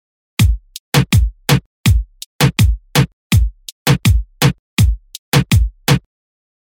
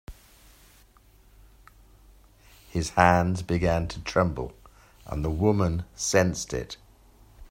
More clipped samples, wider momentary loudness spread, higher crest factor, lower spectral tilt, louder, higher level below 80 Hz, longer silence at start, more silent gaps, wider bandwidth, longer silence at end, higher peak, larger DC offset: neither; second, 6 LU vs 16 LU; second, 14 dB vs 24 dB; about the same, -5 dB/octave vs -5.5 dB/octave; first, -16 LUFS vs -26 LUFS; first, -20 dBFS vs -44 dBFS; first, 0.4 s vs 0.1 s; first, 0.80-0.92 s, 1.66-1.84 s, 2.26-2.39 s, 3.13-3.30 s, 3.72-3.86 s, 4.59-4.77 s, 5.18-5.32 s vs none; first, 19.5 kHz vs 16 kHz; first, 0.65 s vs 0.05 s; about the same, -2 dBFS vs -4 dBFS; neither